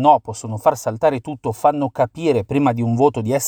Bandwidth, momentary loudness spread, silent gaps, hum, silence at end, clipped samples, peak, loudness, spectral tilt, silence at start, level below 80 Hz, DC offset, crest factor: over 20 kHz; 4 LU; none; none; 0 s; under 0.1%; 0 dBFS; -19 LUFS; -6.5 dB/octave; 0 s; -54 dBFS; under 0.1%; 18 dB